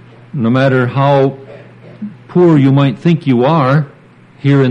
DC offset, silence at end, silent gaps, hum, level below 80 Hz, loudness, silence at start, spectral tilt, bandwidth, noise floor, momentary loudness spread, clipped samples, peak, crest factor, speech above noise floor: under 0.1%; 0 s; none; none; -54 dBFS; -12 LUFS; 0.35 s; -9 dB/octave; 6.2 kHz; -41 dBFS; 18 LU; under 0.1%; 0 dBFS; 12 dB; 31 dB